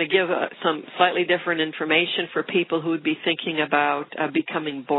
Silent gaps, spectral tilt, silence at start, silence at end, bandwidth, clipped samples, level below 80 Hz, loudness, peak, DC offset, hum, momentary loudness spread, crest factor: none; -1.5 dB/octave; 0 s; 0 s; 4.1 kHz; under 0.1%; -72 dBFS; -23 LUFS; -2 dBFS; under 0.1%; none; 5 LU; 20 dB